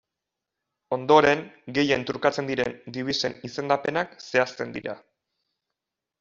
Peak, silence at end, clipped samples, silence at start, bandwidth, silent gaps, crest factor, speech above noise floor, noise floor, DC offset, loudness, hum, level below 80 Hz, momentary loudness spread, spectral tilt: -4 dBFS; 1.25 s; under 0.1%; 0.9 s; 7.6 kHz; none; 24 dB; 61 dB; -86 dBFS; under 0.1%; -25 LUFS; none; -64 dBFS; 14 LU; -3 dB/octave